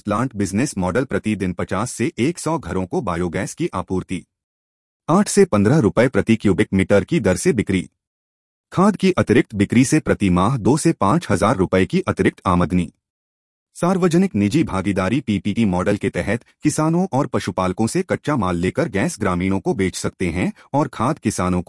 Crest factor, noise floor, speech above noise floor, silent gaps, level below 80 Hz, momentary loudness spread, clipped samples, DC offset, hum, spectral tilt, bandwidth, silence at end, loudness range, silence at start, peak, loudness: 16 dB; under -90 dBFS; over 72 dB; 4.44-5.00 s, 8.07-8.64 s, 13.10-13.66 s; -48 dBFS; 7 LU; under 0.1%; under 0.1%; none; -6 dB/octave; 12 kHz; 0.05 s; 5 LU; 0.05 s; -2 dBFS; -19 LUFS